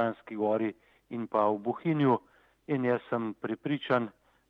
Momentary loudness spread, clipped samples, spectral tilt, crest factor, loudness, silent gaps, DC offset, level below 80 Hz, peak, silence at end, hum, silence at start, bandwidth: 8 LU; under 0.1%; -9 dB/octave; 18 dB; -31 LUFS; none; under 0.1%; -76 dBFS; -12 dBFS; 0.4 s; none; 0 s; 5.8 kHz